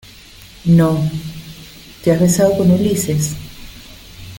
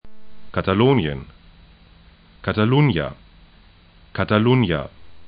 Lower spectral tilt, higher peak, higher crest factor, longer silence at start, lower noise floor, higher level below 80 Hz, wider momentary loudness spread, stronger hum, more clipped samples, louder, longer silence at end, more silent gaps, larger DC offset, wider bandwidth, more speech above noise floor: second, -6.5 dB/octave vs -12 dB/octave; about the same, -2 dBFS vs -2 dBFS; about the same, 16 dB vs 20 dB; first, 0.65 s vs 0.05 s; second, -40 dBFS vs -50 dBFS; about the same, -42 dBFS vs -44 dBFS; first, 24 LU vs 14 LU; neither; neither; first, -15 LUFS vs -20 LUFS; about the same, 0 s vs 0 s; neither; neither; first, 17 kHz vs 5 kHz; second, 26 dB vs 32 dB